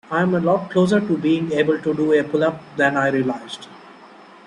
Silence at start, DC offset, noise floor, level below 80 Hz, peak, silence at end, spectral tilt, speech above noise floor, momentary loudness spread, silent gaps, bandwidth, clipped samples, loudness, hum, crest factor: 0.1 s; under 0.1%; -44 dBFS; -60 dBFS; -4 dBFS; 0.4 s; -7 dB/octave; 25 dB; 6 LU; none; 11 kHz; under 0.1%; -19 LUFS; none; 16 dB